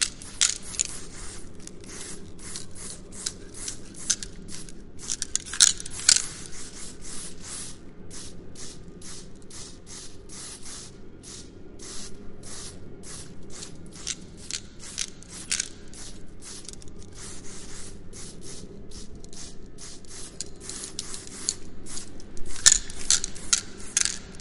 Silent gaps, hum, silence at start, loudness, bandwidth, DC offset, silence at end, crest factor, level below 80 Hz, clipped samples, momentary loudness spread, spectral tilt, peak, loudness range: none; none; 0 s; -26 LUFS; 11.5 kHz; under 0.1%; 0 s; 30 dB; -46 dBFS; under 0.1%; 21 LU; 0 dB/octave; 0 dBFS; 17 LU